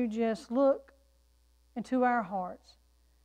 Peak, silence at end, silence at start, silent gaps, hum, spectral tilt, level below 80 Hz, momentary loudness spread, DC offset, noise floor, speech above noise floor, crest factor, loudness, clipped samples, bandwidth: -16 dBFS; 0.7 s; 0 s; none; none; -6.5 dB/octave; -66 dBFS; 15 LU; under 0.1%; -66 dBFS; 36 dB; 16 dB; -31 LUFS; under 0.1%; 10 kHz